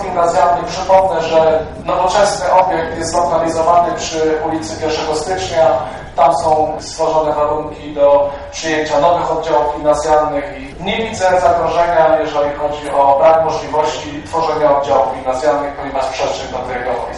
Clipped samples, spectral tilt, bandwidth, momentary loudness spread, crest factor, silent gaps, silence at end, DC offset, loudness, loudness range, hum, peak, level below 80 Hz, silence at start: under 0.1%; -4 dB/octave; 11.5 kHz; 8 LU; 14 dB; none; 0 s; under 0.1%; -14 LUFS; 2 LU; none; 0 dBFS; -38 dBFS; 0 s